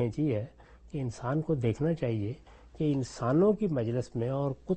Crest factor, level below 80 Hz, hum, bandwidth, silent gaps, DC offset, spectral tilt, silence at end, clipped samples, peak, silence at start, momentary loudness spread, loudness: 14 dB; -56 dBFS; none; 8.4 kHz; none; under 0.1%; -8.5 dB/octave; 0 s; under 0.1%; -16 dBFS; 0 s; 11 LU; -31 LUFS